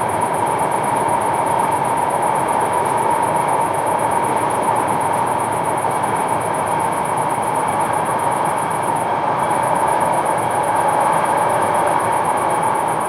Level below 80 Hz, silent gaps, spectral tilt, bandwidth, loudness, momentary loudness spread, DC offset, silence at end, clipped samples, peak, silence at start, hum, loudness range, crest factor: -54 dBFS; none; -4.5 dB/octave; 16 kHz; -18 LUFS; 2 LU; under 0.1%; 0 s; under 0.1%; -2 dBFS; 0 s; none; 2 LU; 14 dB